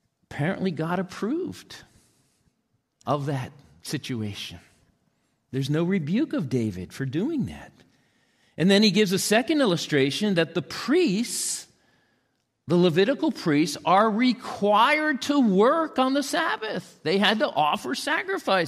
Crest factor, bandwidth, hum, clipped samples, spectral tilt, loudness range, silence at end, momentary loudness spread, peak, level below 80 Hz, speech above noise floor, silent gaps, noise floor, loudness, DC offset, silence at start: 18 dB; 15 kHz; none; under 0.1%; -5 dB/octave; 11 LU; 0 s; 13 LU; -8 dBFS; -64 dBFS; 50 dB; none; -73 dBFS; -24 LUFS; under 0.1%; 0.3 s